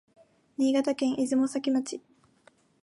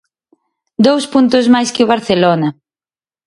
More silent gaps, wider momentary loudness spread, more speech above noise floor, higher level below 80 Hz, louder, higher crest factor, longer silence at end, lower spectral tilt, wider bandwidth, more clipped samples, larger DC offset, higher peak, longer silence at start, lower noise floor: neither; first, 14 LU vs 6 LU; second, 36 dB vs over 79 dB; second, -76 dBFS vs -54 dBFS; second, -28 LUFS vs -12 LUFS; about the same, 14 dB vs 14 dB; about the same, 0.85 s vs 0.75 s; about the same, -4 dB/octave vs -5 dB/octave; about the same, 11.5 kHz vs 11.5 kHz; neither; neither; second, -16 dBFS vs 0 dBFS; second, 0.6 s vs 0.8 s; second, -63 dBFS vs under -90 dBFS